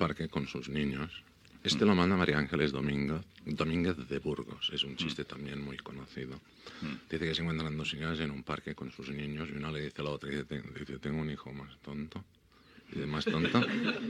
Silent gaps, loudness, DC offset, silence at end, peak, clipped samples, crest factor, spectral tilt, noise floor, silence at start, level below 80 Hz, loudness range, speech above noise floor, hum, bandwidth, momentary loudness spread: none; -34 LUFS; under 0.1%; 0 s; -12 dBFS; under 0.1%; 22 dB; -6 dB/octave; -60 dBFS; 0 s; -58 dBFS; 8 LU; 26 dB; none; 11.5 kHz; 15 LU